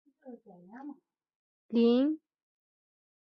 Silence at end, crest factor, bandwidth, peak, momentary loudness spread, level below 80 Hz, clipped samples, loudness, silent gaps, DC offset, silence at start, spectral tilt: 1.05 s; 18 dB; 5.6 kHz; -16 dBFS; 24 LU; -84 dBFS; under 0.1%; -29 LUFS; 1.36-1.69 s; under 0.1%; 0.25 s; -8.5 dB/octave